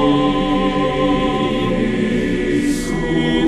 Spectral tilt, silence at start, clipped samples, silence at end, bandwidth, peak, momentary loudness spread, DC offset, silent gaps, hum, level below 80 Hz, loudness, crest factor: -6 dB/octave; 0 s; under 0.1%; 0 s; 13 kHz; -4 dBFS; 2 LU; under 0.1%; none; none; -30 dBFS; -17 LUFS; 12 dB